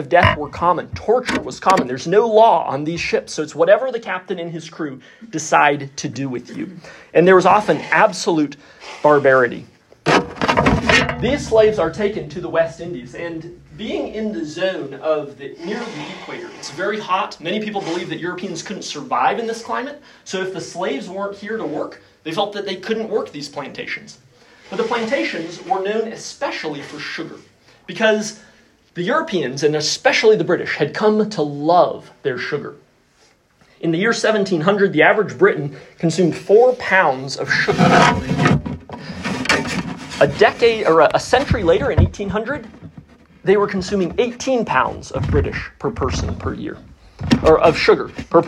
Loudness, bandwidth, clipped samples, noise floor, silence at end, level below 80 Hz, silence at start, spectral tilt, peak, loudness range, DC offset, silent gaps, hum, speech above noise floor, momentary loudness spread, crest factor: -18 LUFS; 12 kHz; under 0.1%; -55 dBFS; 0 s; -40 dBFS; 0 s; -5 dB/octave; 0 dBFS; 9 LU; under 0.1%; none; none; 38 dB; 16 LU; 18 dB